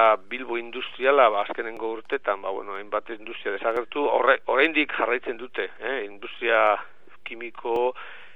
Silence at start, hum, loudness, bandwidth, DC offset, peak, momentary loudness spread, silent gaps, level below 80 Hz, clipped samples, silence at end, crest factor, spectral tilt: 0 s; none; -25 LUFS; 5.6 kHz; 0.9%; -4 dBFS; 14 LU; none; -68 dBFS; under 0.1%; 0.1 s; 22 dB; -5 dB/octave